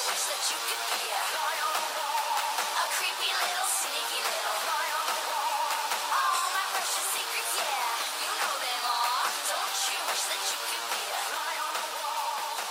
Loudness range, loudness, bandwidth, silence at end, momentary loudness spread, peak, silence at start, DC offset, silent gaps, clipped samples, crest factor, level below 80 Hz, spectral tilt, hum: 1 LU; -28 LUFS; 16 kHz; 0 s; 4 LU; -16 dBFS; 0 s; under 0.1%; none; under 0.1%; 14 dB; under -90 dBFS; 3 dB/octave; none